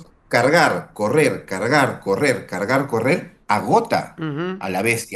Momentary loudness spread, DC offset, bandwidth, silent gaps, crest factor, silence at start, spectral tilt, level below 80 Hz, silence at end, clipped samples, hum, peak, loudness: 8 LU; under 0.1%; 13 kHz; none; 18 dB; 0 s; -5 dB/octave; -58 dBFS; 0 s; under 0.1%; none; -2 dBFS; -19 LUFS